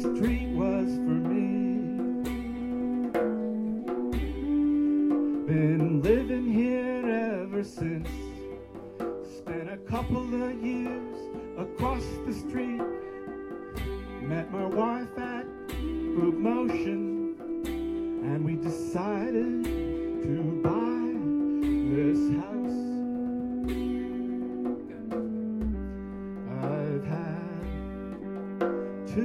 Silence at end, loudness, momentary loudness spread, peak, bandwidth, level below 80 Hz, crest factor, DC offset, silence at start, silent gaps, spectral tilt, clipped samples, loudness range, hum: 0 s; -30 LUFS; 11 LU; -12 dBFS; 14 kHz; -44 dBFS; 18 dB; under 0.1%; 0 s; none; -8 dB/octave; under 0.1%; 7 LU; none